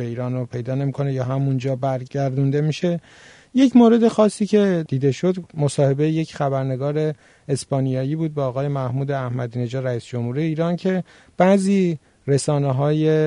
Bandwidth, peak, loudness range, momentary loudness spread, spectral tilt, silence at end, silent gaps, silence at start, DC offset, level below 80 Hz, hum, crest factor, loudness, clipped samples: 10.5 kHz; -4 dBFS; 6 LU; 10 LU; -7.5 dB/octave; 0 s; none; 0 s; under 0.1%; -60 dBFS; none; 16 dB; -21 LUFS; under 0.1%